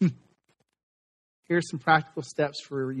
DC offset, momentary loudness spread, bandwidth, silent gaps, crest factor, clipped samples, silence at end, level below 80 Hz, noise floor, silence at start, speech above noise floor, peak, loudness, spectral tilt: under 0.1%; 9 LU; 10 kHz; 0.83-1.43 s; 22 dB; under 0.1%; 0 s; -72 dBFS; -73 dBFS; 0 s; 46 dB; -8 dBFS; -27 LUFS; -6 dB/octave